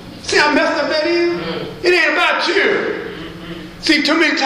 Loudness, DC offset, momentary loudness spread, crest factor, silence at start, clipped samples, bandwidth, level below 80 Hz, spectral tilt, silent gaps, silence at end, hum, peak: -15 LUFS; under 0.1%; 16 LU; 16 dB; 0 s; under 0.1%; 13.5 kHz; -46 dBFS; -3 dB/octave; none; 0 s; none; 0 dBFS